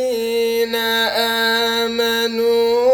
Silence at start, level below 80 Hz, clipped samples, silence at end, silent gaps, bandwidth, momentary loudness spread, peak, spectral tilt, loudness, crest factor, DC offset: 0 s; -54 dBFS; under 0.1%; 0 s; none; 19 kHz; 3 LU; -6 dBFS; -2 dB/octave; -17 LUFS; 12 dB; under 0.1%